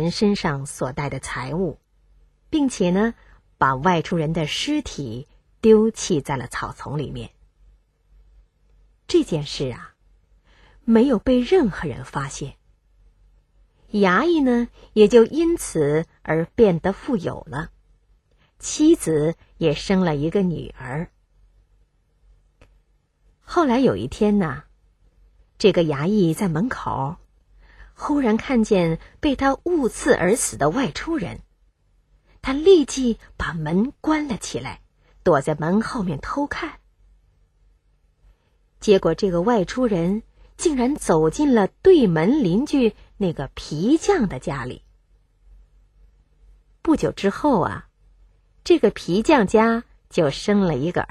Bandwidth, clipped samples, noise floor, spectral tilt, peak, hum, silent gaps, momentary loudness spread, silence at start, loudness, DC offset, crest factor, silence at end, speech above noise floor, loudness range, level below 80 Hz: 13 kHz; under 0.1%; -62 dBFS; -5.5 dB/octave; -2 dBFS; none; none; 13 LU; 0 s; -21 LUFS; under 0.1%; 20 dB; 0.05 s; 42 dB; 7 LU; -44 dBFS